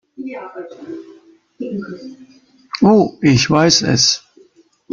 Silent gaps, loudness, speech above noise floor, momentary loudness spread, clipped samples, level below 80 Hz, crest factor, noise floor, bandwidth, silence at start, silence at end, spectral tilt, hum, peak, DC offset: none; -14 LUFS; 35 dB; 21 LU; under 0.1%; -48 dBFS; 18 dB; -51 dBFS; 7.4 kHz; 0.2 s; 0.75 s; -4 dB/octave; none; 0 dBFS; under 0.1%